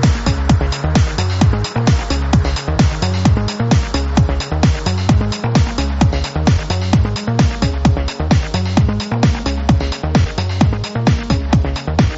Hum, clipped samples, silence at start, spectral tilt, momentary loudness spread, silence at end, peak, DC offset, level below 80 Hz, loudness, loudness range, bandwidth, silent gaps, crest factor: none; under 0.1%; 0 s; -6 dB/octave; 2 LU; 0 s; 0 dBFS; under 0.1%; -20 dBFS; -16 LUFS; 1 LU; 8 kHz; none; 14 dB